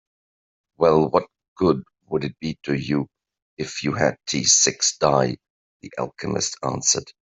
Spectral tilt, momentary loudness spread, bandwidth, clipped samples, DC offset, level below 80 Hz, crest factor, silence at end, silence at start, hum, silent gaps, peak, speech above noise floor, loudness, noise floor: -3 dB/octave; 14 LU; 8.2 kHz; under 0.1%; under 0.1%; -56 dBFS; 20 dB; 0.1 s; 0.8 s; none; 1.48-1.56 s, 3.42-3.57 s, 5.50-5.80 s; -2 dBFS; over 68 dB; -21 LUFS; under -90 dBFS